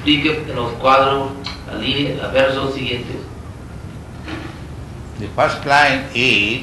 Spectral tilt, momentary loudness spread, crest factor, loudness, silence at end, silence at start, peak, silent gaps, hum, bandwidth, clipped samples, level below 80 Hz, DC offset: -5 dB/octave; 20 LU; 16 dB; -16 LUFS; 0 s; 0 s; -2 dBFS; none; none; 12 kHz; under 0.1%; -38 dBFS; under 0.1%